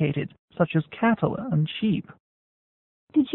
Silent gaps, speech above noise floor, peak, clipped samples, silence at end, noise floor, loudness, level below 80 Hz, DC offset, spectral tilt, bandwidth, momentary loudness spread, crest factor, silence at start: 0.39-0.48 s, 2.20-3.07 s; over 65 dB; -10 dBFS; under 0.1%; 0 s; under -90 dBFS; -25 LUFS; -60 dBFS; under 0.1%; -11.5 dB/octave; 4.1 kHz; 7 LU; 16 dB; 0 s